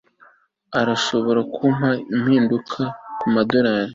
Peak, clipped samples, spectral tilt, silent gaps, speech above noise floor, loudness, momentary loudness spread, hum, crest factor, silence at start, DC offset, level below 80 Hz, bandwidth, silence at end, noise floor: -2 dBFS; under 0.1%; -6 dB/octave; none; 35 dB; -20 LUFS; 9 LU; none; 18 dB; 0.7 s; under 0.1%; -58 dBFS; 7.8 kHz; 0 s; -54 dBFS